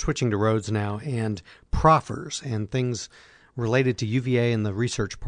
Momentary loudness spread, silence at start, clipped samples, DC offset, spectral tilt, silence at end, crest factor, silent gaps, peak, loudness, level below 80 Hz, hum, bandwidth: 12 LU; 0 s; under 0.1%; under 0.1%; -6 dB/octave; 0 s; 20 dB; none; -6 dBFS; -25 LUFS; -40 dBFS; none; 10 kHz